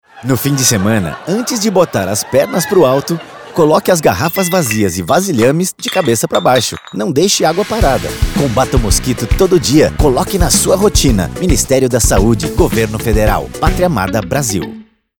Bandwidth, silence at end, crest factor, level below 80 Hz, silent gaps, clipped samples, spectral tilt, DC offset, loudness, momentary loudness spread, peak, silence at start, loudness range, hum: over 20 kHz; 0.35 s; 12 dB; -22 dBFS; none; under 0.1%; -4.5 dB/octave; 0.3%; -12 LUFS; 6 LU; 0 dBFS; 0.15 s; 2 LU; none